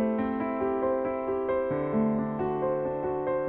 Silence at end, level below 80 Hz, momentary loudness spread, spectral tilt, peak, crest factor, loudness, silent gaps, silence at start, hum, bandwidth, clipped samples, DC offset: 0 s; -54 dBFS; 3 LU; -11 dB/octave; -16 dBFS; 12 dB; -29 LUFS; none; 0 s; none; 4 kHz; under 0.1%; under 0.1%